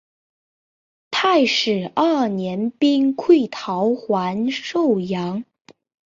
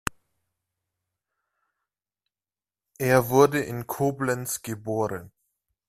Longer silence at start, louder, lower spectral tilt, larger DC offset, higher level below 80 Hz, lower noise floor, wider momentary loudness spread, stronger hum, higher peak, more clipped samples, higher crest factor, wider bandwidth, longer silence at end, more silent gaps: second, 1.1 s vs 3 s; first, -19 LUFS vs -25 LUFS; about the same, -5.5 dB/octave vs -5.5 dB/octave; neither; second, -66 dBFS vs -58 dBFS; about the same, under -90 dBFS vs under -90 dBFS; second, 8 LU vs 12 LU; neither; about the same, -4 dBFS vs -4 dBFS; neither; second, 18 dB vs 24 dB; second, 7.6 kHz vs 16 kHz; about the same, 0.7 s vs 0.6 s; neither